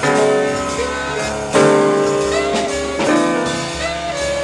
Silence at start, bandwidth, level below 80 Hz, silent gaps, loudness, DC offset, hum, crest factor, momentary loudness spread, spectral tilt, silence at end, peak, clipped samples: 0 s; 12 kHz; -38 dBFS; none; -17 LUFS; under 0.1%; none; 16 dB; 8 LU; -4 dB/octave; 0 s; 0 dBFS; under 0.1%